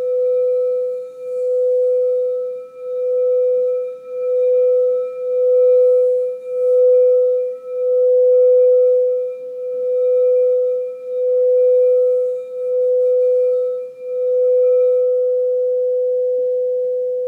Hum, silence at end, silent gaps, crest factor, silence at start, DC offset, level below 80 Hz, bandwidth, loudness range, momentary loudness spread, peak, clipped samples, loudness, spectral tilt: none; 0 s; none; 8 dB; 0 s; under 0.1%; under -90 dBFS; 2.5 kHz; 4 LU; 11 LU; -8 dBFS; under 0.1%; -16 LUFS; -5.5 dB/octave